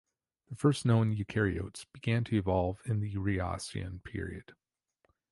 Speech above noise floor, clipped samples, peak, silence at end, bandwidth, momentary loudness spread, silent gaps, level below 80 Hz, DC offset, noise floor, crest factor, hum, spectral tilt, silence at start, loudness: 44 dB; under 0.1%; -14 dBFS; 0.8 s; 11.5 kHz; 13 LU; none; -50 dBFS; under 0.1%; -75 dBFS; 18 dB; none; -7 dB/octave; 0.5 s; -32 LUFS